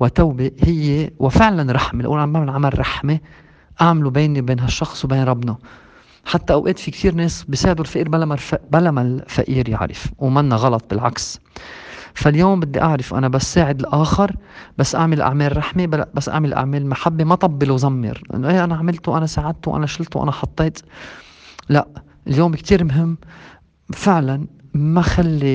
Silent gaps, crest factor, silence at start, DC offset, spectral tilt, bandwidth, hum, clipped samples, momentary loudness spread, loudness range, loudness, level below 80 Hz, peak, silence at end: none; 18 dB; 0 s; under 0.1%; -6.5 dB/octave; 9.2 kHz; none; under 0.1%; 10 LU; 3 LU; -18 LUFS; -34 dBFS; 0 dBFS; 0 s